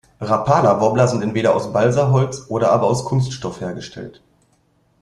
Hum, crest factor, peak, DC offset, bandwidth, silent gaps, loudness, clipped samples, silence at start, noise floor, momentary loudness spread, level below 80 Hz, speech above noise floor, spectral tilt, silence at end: none; 18 dB; 0 dBFS; under 0.1%; 11 kHz; none; -18 LUFS; under 0.1%; 0.2 s; -60 dBFS; 14 LU; -50 dBFS; 43 dB; -6.5 dB/octave; 0.9 s